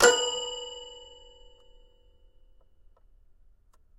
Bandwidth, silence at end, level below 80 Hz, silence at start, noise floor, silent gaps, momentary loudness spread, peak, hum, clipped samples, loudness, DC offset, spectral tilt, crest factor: 15.5 kHz; 2.95 s; -58 dBFS; 0 s; -59 dBFS; none; 28 LU; -4 dBFS; none; under 0.1%; -28 LUFS; under 0.1%; 0 dB/octave; 28 dB